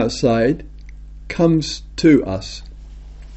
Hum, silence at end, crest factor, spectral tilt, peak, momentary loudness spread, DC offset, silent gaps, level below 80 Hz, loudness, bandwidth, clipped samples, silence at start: none; 0 s; 16 dB; -6 dB/octave; -2 dBFS; 15 LU; under 0.1%; none; -36 dBFS; -18 LUFS; 8.2 kHz; under 0.1%; 0 s